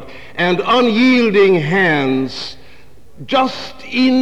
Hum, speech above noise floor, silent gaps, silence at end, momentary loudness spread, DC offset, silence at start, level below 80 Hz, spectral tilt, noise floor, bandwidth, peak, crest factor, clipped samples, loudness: none; 32 dB; none; 0 s; 14 LU; 2%; 0 s; -52 dBFS; -6 dB/octave; -45 dBFS; 9 kHz; -2 dBFS; 12 dB; under 0.1%; -14 LUFS